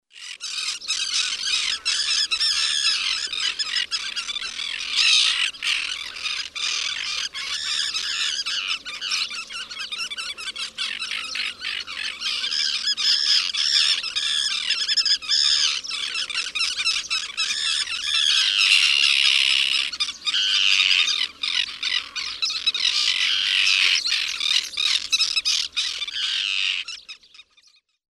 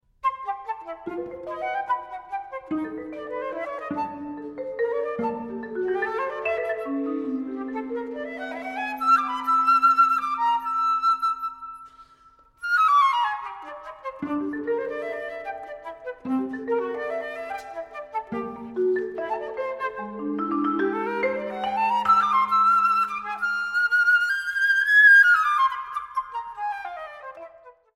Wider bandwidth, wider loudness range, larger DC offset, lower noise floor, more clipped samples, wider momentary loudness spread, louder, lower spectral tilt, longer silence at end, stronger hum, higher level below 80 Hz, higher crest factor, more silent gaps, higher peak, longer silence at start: about the same, 14.5 kHz vs 15.5 kHz; second, 7 LU vs 13 LU; neither; first, -59 dBFS vs -55 dBFS; neither; second, 11 LU vs 16 LU; first, -20 LUFS vs -23 LUFS; second, 3.5 dB/octave vs -4 dB/octave; first, 0.7 s vs 0.25 s; neither; about the same, -62 dBFS vs -64 dBFS; about the same, 22 dB vs 18 dB; neither; first, -2 dBFS vs -6 dBFS; about the same, 0.15 s vs 0.25 s